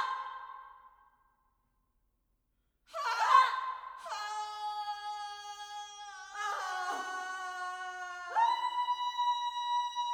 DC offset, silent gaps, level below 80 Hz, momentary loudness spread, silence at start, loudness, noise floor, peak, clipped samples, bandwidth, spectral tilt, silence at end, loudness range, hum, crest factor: under 0.1%; none; -78 dBFS; 15 LU; 0 s; -34 LUFS; -78 dBFS; -12 dBFS; under 0.1%; 16 kHz; 1.5 dB/octave; 0 s; 7 LU; none; 24 dB